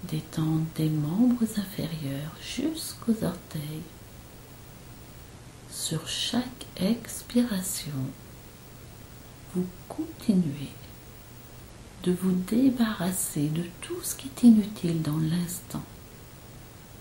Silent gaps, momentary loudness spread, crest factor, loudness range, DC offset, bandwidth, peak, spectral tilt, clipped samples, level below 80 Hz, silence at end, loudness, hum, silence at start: none; 22 LU; 20 dB; 9 LU; under 0.1%; 16.5 kHz; -8 dBFS; -5.5 dB/octave; under 0.1%; -54 dBFS; 0 s; -28 LUFS; none; 0 s